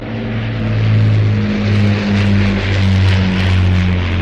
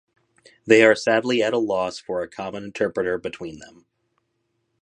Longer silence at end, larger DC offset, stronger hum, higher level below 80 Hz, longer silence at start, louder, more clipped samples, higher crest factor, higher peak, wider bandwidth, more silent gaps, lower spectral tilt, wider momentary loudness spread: second, 0 s vs 1.15 s; neither; neither; first, -28 dBFS vs -62 dBFS; second, 0 s vs 0.65 s; first, -14 LUFS vs -21 LUFS; neither; second, 8 dB vs 22 dB; about the same, -4 dBFS vs -2 dBFS; second, 7.4 kHz vs 10.5 kHz; neither; first, -7.5 dB/octave vs -4.5 dB/octave; second, 5 LU vs 17 LU